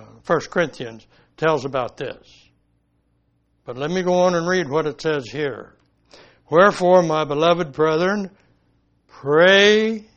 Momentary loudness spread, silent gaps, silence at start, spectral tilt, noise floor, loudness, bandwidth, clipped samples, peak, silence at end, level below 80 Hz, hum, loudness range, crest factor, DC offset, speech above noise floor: 19 LU; none; 0.3 s; -5 dB/octave; -65 dBFS; -18 LUFS; 9 kHz; under 0.1%; 0 dBFS; 0.15 s; -58 dBFS; none; 9 LU; 20 dB; under 0.1%; 47 dB